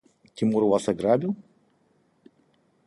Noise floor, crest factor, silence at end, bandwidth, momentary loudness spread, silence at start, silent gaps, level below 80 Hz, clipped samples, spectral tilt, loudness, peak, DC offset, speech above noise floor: -66 dBFS; 20 dB; 1.45 s; 11.5 kHz; 9 LU; 0.35 s; none; -64 dBFS; under 0.1%; -7 dB/octave; -24 LUFS; -8 dBFS; under 0.1%; 43 dB